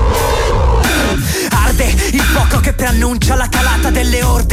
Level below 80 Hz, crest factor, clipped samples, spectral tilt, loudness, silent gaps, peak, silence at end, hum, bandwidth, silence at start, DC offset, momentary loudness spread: -14 dBFS; 8 dB; under 0.1%; -4.5 dB/octave; -13 LUFS; none; -2 dBFS; 0 s; none; 16 kHz; 0 s; under 0.1%; 2 LU